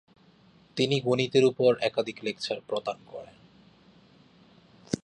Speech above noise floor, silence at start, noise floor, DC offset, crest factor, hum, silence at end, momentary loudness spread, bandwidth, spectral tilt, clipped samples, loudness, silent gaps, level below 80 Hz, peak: 32 dB; 0.75 s; -59 dBFS; under 0.1%; 20 dB; none; 0.1 s; 17 LU; 10 kHz; -5.5 dB/octave; under 0.1%; -27 LUFS; none; -70 dBFS; -10 dBFS